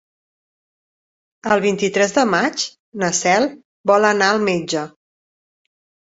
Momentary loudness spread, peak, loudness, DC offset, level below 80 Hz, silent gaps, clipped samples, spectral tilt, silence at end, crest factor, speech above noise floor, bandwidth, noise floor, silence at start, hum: 10 LU; -2 dBFS; -18 LUFS; under 0.1%; -62 dBFS; 2.79-2.92 s, 3.65-3.84 s; under 0.1%; -3.5 dB/octave; 1.25 s; 18 dB; over 73 dB; 8 kHz; under -90 dBFS; 1.45 s; none